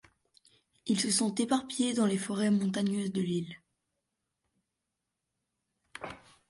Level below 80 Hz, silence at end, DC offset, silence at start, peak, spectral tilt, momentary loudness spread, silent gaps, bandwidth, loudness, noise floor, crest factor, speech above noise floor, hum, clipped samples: -72 dBFS; 0.35 s; under 0.1%; 0.85 s; -16 dBFS; -4.5 dB/octave; 17 LU; none; 11.5 kHz; -30 LUFS; -86 dBFS; 18 dB; 56 dB; none; under 0.1%